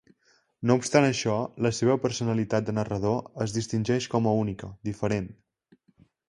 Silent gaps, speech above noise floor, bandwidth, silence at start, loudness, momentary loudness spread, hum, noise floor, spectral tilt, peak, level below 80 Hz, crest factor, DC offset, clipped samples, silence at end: none; 41 dB; 11.5 kHz; 0.6 s; -27 LUFS; 9 LU; none; -67 dBFS; -6 dB/octave; -4 dBFS; -56 dBFS; 22 dB; under 0.1%; under 0.1%; 0.95 s